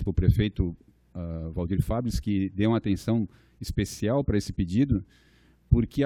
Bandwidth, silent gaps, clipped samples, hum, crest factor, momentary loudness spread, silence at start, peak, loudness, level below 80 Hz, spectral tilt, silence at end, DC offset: 15 kHz; none; under 0.1%; none; 20 dB; 12 LU; 0 s; -6 dBFS; -27 LUFS; -36 dBFS; -7.5 dB/octave; 0 s; under 0.1%